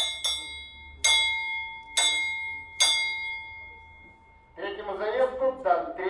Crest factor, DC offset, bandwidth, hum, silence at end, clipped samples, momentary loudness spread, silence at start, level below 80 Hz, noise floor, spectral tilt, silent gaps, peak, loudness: 20 dB; under 0.1%; 11.5 kHz; none; 0 s; under 0.1%; 17 LU; 0 s; -58 dBFS; -54 dBFS; 0.5 dB/octave; none; -8 dBFS; -26 LUFS